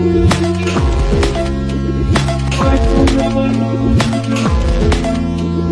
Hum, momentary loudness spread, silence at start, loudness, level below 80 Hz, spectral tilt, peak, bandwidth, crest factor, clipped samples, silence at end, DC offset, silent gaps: none; 5 LU; 0 s; -14 LUFS; -18 dBFS; -6.5 dB/octave; -2 dBFS; 11 kHz; 12 dB; under 0.1%; 0 s; under 0.1%; none